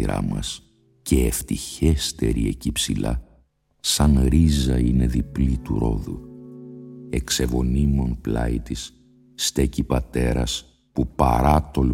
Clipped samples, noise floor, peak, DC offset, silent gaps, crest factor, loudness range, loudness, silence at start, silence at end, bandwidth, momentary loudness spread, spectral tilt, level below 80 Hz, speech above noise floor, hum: under 0.1%; -60 dBFS; -4 dBFS; under 0.1%; none; 18 dB; 4 LU; -22 LUFS; 0 s; 0 s; 16.5 kHz; 14 LU; -5.5 dB/octave; -28 dBFS; 39 dB; none